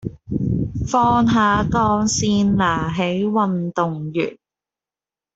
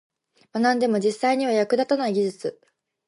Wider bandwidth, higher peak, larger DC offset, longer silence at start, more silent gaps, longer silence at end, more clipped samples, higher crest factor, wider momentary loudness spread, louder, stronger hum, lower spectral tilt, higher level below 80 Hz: second, 8 kHz vs 11.5 kHz; first, -4 dBFS vs -8 dBFS; neither; second, 0.05 s vs 0.55 s; neither; first, 1 s vs 0.55 s; neither; about the same, 16 dB vs 16 dB; second, 8 LU vs 11 LU; first, -19 LUFS vs -23 LUFS; neither; about the same, -5.5 dB/octave vs -5 dB/octave; first, -40 dBFS vs -76 dBFS